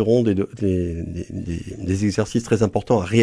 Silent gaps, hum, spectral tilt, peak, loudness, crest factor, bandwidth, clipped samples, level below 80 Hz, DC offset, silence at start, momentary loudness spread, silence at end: none; none; -7 dB/octave; -4 dBFS; -22 LUFS; 16 dB; 11 kHz; under 0.1%; -42 dBFS; under 0.1%; 0 s; 11 LU; 0 s